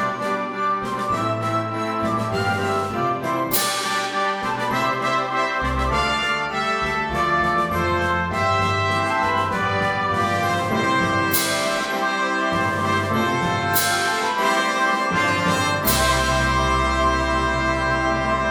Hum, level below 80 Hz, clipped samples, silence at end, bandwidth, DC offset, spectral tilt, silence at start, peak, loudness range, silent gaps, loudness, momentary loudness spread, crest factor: none; -36 dBFS; under 0.1%; 0 s; 17 kHz; under 0.1%; -4 dB/octave; 0 s; -4 dBFS; 3 LU; none; -20 LUFS; 4 LU; 16 dB